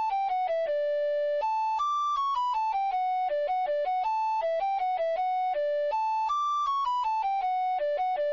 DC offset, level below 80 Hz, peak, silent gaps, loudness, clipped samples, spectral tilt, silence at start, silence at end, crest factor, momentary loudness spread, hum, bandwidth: under 0.1%; -66 dBFS; -22 dBFS; none; -28 LUFS; under 0.1%; -0.5 dB/octave; 0 s; 0 s; 4 dB; 1 LU; none; 7.4 kHz